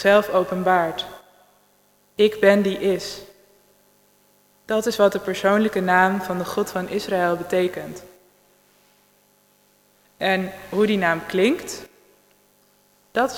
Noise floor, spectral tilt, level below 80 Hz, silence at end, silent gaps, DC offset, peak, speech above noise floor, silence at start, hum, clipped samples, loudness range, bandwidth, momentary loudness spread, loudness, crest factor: -60 dBFS; -5 dB/octave; -60 dBFS; 0 s; none; under 0.1%; -4 dBFS; 40 dB; 0 s; 50 Hz at -50 dBFS; under 0.1%; 7 LU; 18 kHz; 16 LU; -21 LUFS; 20 dB